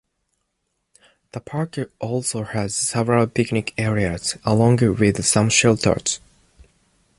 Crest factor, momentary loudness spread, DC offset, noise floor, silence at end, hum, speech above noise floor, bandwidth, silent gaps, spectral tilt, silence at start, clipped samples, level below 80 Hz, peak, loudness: 18 dB; 12 LU; under 0.1%; -74 dBFS; 1 s; none; 55 dB; 11.5 kHz; none; -4.5 dB/octave; 1.35 s; under 0.1%; -46 dBFS; -2 dBFS; -20 LUFS